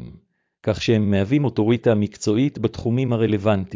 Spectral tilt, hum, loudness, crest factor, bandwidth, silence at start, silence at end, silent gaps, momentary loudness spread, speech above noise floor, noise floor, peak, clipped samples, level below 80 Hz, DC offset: -7 dB/octave; none; -21 LUFS; 16 dB; 7.6 kHz; 0 s; 0 s; none; 4 LU; 33 dB; -53 dBFS; -6 dBFS; under 0.1%; -44 dBFS; under 0.1%